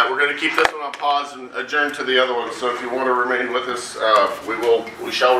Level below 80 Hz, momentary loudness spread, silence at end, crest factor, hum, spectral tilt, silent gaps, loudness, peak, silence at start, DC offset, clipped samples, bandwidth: -58 dBFS; 7 LU; 0 s; 20 dB; none; -2 dB/octave; none; -20 LUFS; 0 dBFS; 0 s; under 0.1%; under 0.1%; 15.5 kHz